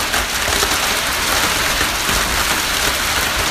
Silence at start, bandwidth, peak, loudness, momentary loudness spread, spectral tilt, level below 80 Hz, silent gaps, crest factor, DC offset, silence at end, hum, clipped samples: 0 s; 15.5 kHz; 0 dBFS; -15 LUFS; 1 LU; -1 dB/octave; -30 dBFS; none; 16 dB; under 0.1%; 0 s; none; under 0.1%